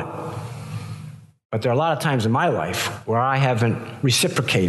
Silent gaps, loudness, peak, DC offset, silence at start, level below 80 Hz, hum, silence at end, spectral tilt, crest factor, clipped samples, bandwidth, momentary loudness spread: 1.45-1.49 s; -21 LUFS; -8 dBFS; under 0.1%; 0 s; -60 dBFS; none; 0 s; -5 dB/octave; 14 dB; under 0.1%; 12.5 kHz; 14 LU